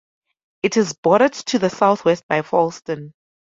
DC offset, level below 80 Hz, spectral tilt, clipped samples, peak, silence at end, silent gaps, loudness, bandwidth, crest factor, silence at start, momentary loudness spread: under 0.1%; -62 dBFS; -5 dB/octave; under 0.1%; -2 dBFS; 0.35 s; 0.98-1.03 s, 2.23-2.29 s; -18 LUFS; 7.8 kHz; 18 dB; 0.65 s; 10 LU